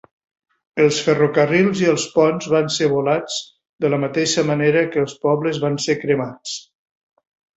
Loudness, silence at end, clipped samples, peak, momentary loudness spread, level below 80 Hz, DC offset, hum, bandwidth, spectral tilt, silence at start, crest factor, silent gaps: -18 LUFS; 0.95 s; under 0.1%; -2 dBFS; 11 LU; -60 dBFS; under 0.1%; none; 8.2 kHz; -5 dB/octave; 0.75 s; 16 dB; 3.69-3.73 s